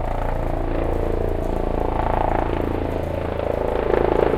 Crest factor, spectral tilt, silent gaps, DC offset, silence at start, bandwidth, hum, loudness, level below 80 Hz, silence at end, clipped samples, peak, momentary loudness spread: 20 dB; -8.5 dB/octave; none; under 0.1%; 0 s; 13.5 kHz; none; -23 LUFS; -26 dBFS; 0 s; under 0.1%; 0 dBFS; 5 LU